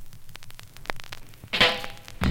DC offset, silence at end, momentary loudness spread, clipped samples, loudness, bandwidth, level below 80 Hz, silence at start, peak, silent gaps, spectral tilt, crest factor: under 0.1%; 0 s; 25 LU; under 0.1%; -25 LUFS; 17 kHz; -42 dBFS; 0 s; -6 dBFS; none; -3.5 dB/octave; 24 dB